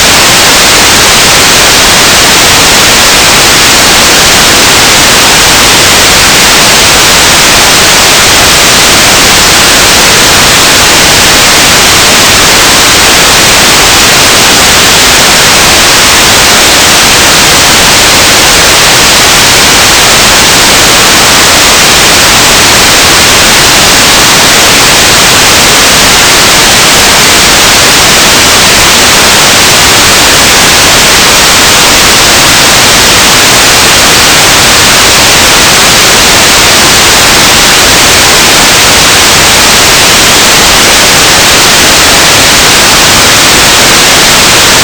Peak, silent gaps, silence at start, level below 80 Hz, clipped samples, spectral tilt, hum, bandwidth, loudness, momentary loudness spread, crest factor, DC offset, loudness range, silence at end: 0 dBFS; none; 0 s; -22 dBFS; 40%; -1 dB/octave; none; over 20 kHz; 0 LUFS; 0 LU; 2 dB; 0.4%; 0 LU; 0 s